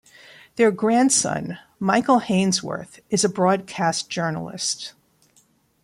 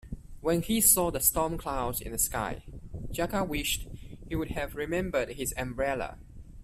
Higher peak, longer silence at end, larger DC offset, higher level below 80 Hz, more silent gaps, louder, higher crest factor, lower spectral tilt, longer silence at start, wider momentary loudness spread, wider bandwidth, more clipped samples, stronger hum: first, -4 dBFS vs -8 dBFS; first, 0.95 s vs 0 s; neither; second, -64 dBFS vs -44 dBFS; neither; first, -21 LUFS vs -29 LUFS; second, 18 dB vs 24 dB; about the same, -4 dB/octave vs -3.5 dB/octave; first, 0.55 s vs 0.05 s; second, 13 LU vs 17 LU; about the same, 15.5 kHz vs 16 kHz; neither; neither